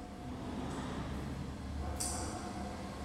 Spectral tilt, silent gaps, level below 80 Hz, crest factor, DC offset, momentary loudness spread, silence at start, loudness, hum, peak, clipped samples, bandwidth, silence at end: -4.5 dB/octave; none; -48 dBFS; 18 dB; under 0.1%; 6 LU; 0 s; -41 LUFS; none; -24 dBFS; under 0.1%; 16 kHz; 0 s